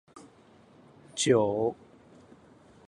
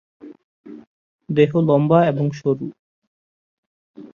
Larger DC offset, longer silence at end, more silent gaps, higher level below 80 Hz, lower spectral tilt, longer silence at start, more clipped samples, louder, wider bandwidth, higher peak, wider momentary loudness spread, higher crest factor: neither; first, 1.15 s vs 0.05 s; second, none vs 0.44-0.64 s, 0.87-1.19 s, 2.79-3.94 s; second, -68 dBFS vs -62 dBFS; second, -4.5 dB/octave vs -9 dB/octave; about the same, 0.15 s vs 0.25 s; neither; second, -27 LUFS vs -18 LUFS; first, 11.5 kHz vs 7 kHz; second, -12 dBFS vs -2 dBFS; first, 18 LU vs 10 LU; about the same, 20 dB vs 20 dB